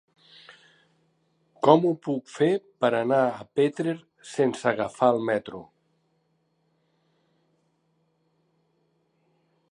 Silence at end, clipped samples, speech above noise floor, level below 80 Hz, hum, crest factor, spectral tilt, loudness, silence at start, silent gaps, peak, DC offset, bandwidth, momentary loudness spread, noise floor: 4.1 s; under 0.1%; 47 dB; -74 dBFS; none; 26 dB; -6.5 dB/octave; -25 LUFS; 1.65 s; none; -2 dBFS; under 0.1%; 10.5 kHz; 11 LU; -71 dBFS